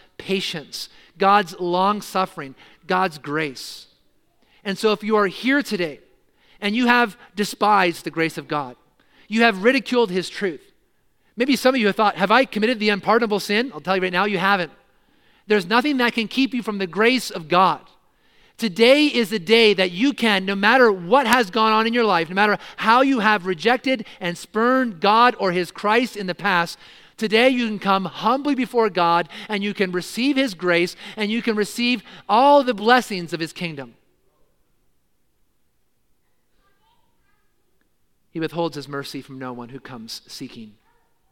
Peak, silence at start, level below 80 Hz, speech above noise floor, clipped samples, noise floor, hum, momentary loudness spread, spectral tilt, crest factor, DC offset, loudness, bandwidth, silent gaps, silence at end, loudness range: 0 dBFS; 0.2 s; -64 dBFS; 50 dB; under 0.1%; -70 dBFS; none; 14 LU; -4.5 dB/octave; 20 dB; under 0.1%; -20 LUFS; 17 kHz; none; 0.65 s; 9 LU